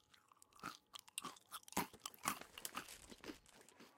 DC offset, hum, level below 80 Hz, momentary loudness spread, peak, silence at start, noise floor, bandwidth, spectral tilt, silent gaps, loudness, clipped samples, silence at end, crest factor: under 0.1%; none; -78 dBFS; 19 LU; -20 dBFS; 0.1 s; -71 dBFS; 16.5 kHz; -2 dB/octave; none; -49 LUFS; under 0.1%; 0 s; 32 dB